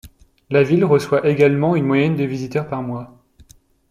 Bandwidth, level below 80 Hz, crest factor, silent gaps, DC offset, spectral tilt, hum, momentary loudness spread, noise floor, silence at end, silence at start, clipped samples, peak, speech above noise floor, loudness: 14 kHz; -52 dBFS; 16 dB; none; under 0.1%; -8 dB/octave; none; 11 LU; -50 dBFS; 0.85 s; 0.05 s; under 0.1%; -2 dBFS; 33 dB; -18 LUFS